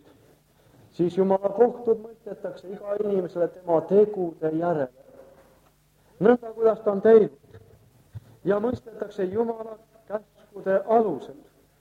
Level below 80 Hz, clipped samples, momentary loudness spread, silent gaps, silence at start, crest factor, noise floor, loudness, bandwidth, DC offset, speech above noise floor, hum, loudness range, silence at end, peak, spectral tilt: -64 dBFS; under 0.1%; 16 LU; none; 1 s; 20 dB; -61 dBFS; -24 LUFS; 7 kHz; under 0.1%; 38 dB; none; 5 LU; 0.45 s; -4 dBFS; -9 dB/octave